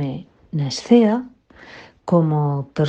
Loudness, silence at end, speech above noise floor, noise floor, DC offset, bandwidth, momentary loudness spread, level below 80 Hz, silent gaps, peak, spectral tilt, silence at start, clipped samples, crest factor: -19 LUFS; 0 s; 26 dB; -44 dBFS; under 0.1%; 8.8 kHz; 20 LU; -58 dBFS; none; -2 dBFS; -7.5 dB/octave; 0 s; under 0.1%; 18 dB